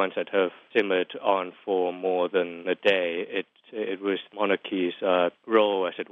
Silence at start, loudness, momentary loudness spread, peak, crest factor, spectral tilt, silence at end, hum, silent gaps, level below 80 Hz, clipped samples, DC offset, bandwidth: 0 s; -26 LUFS; 7 LU; -6 dBFS; 20 dB; -6.5 dB/octave; 0.1 s; none; none; -82 dBFS; under 0.1%; under 0.1%; 6.6 kHz